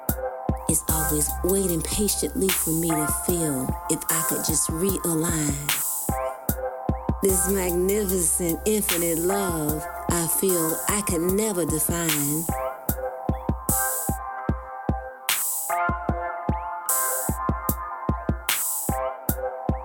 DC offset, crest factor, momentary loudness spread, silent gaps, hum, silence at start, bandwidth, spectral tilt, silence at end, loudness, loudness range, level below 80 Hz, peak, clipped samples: under 0.1%; 22 dB; 7 LU; none; none; 0 s; 18.5 kHz; -4 dB/octave; 0 s; -24 LUFS; 3 LU; -36 dBFS; -2 dBFS; under 0.1%